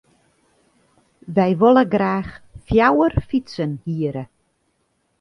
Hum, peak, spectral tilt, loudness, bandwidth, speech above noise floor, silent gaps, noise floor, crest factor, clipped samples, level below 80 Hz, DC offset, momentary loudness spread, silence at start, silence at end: none; -2 dBFS; -8.5 dB/octave; -19 LUFS; 10.5 kHz; 50 dB; none; -68 dBFS; 18 dB; under 0.1%; -40 dBFS; under 0.1%; 12 LU; 1.3 s; 0.95 s